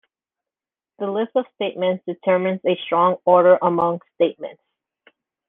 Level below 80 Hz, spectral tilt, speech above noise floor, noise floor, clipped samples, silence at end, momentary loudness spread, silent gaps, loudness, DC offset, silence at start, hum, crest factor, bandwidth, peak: -68 dBFS; -9.5 dB/octave; over 71 dB; under -90 dBFS; under 0.1%; 0.95 s; 12 LU; none; -20 LUFS; under 0.1%; 1 s; none; 20 dB; 3.9 kHz; -2 dBFS